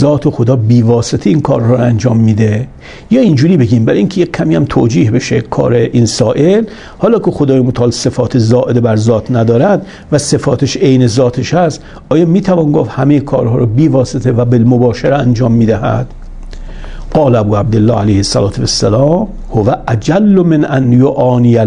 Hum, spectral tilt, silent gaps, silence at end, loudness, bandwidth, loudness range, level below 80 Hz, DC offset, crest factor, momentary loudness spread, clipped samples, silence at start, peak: none; -7 dB/octave; none; 0 s; -10 LUFS; 10.5 kHz; 2 LU; -32 dBFS; under 0.1%; 10 dB; 5 LU; 0.2%; 0 s; 0 dBFS